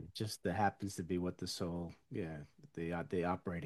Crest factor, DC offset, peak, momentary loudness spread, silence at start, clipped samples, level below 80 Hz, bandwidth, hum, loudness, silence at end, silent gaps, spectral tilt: 20 dB; under 0.1%; -20 dBFS; 9 LU; 0 s; under 0.1%; -64 dBFS; 12.5 kHz; none; -40 LUFS; 0 s; none; -5.5 dB/octave